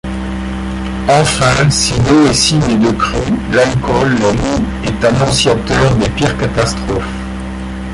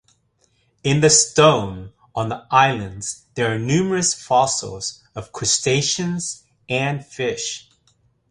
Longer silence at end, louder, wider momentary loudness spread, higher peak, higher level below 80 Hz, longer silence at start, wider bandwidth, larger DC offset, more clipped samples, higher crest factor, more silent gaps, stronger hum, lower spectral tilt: second, 0 s vs 0.7 s; first, -13 LUFS vs -19 LUFS; second, 11 LU vs 16 LU; about the same, 0 dBFS vs -2 dBFS; first, -26 dBFS vs -52 dBFS; second, 0.05 s vs 0.85 s; about the same, 11.5 kHz vs 11.5 kHz; neither; neither; second, 12 dB vs 20 dB; neither; neither; about the same, -4.5 dB/octave vs -3.5 dB/octave